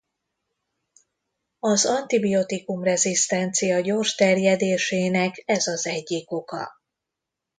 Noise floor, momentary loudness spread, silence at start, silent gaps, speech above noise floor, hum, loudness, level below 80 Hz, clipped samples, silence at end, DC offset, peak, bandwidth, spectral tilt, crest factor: -85 dBFS; 9 LU; 1.65 s; none; 62 dB; none; -22 LUFS; -68 dBFS; under 0.1%; 0.9 s; under 0.1%; -6 dBFS; 9.6 kHz; -3.5 dB/octave; 18 dB